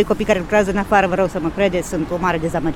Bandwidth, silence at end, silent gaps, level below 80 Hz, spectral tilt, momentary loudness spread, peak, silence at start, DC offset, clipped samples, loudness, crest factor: 16 kHz; 0 s; none; -36 dBFS; -6 dB/octave; 4 LU; -2 dBFS; 0 s; under 0.1%; under 0.1%; -18 LUFS; 16 dB